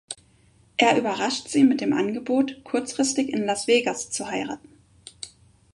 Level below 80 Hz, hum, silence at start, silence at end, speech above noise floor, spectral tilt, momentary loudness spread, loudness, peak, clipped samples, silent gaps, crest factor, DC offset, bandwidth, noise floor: -64 dBFS; none; 0.1 s; 0.5 s; 35 dB; -3 dB/octave; 19 LU; -23 LUFS; -4 dBFS; under 0.1%; none; 20 dB; under 0.1%; 11.5 kHz; -58 dBFS